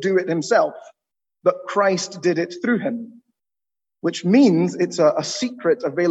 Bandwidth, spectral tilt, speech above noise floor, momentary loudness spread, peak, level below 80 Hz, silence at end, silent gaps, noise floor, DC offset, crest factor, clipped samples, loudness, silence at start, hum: 8.4 kHz; -5.5 dB/octave; over 71 dB; 10 LU; -4 dBFS; -70 dBFS; 0 s; none; under -90 dBFS; under 0.1%; 16 dB; under 0.1%; -20 LUFS; 0 s; none